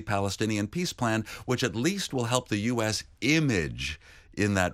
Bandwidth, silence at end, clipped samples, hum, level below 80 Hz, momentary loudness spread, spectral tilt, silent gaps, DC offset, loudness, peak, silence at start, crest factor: 16 kHz; 0 s; under 0.1%; none; -50 dBFS; 7 LU; -4.5 dB/octave; none; under 0.1%; -28 LUFS; -10 dBFS; 0 s; 20 dB